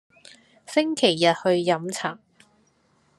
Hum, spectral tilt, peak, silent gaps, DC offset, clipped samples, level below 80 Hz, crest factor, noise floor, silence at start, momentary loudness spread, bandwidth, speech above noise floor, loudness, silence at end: none; -4 dB/octave; -4 dBFS; none; under 0.1%; under 0.1%; -74 dBFS; 20 dB; -64 dBFS; 0.7 s; 11 LU; 12.5 kHz; 42 dB; -23 LUFS; 1.05 s